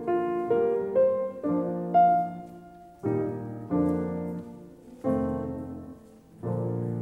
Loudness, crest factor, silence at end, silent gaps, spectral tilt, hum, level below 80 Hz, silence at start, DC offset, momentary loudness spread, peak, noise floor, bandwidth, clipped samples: -28 LUFS; 16 dB; 0 s; none; -10 dB/octave; none; -58 dBFS; 0 s; under 0.1%; 19 LU; -12 dBFS; -51 dBFS; 10.5 kHz; under 0.1%